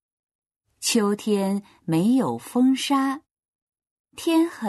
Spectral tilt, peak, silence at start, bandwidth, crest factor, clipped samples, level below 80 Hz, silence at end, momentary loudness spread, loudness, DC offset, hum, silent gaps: -4.5 dB/octave; -10 dBFS; 0.8 s; 12.5 kHz; 14 dB; under 0.1%; -70 dBFS; 0 s; 7 LU; -23 LUFS; under 0.1%; none; 3.31-3.35 s, 3.48-3.67 s, 3.91-4.04 s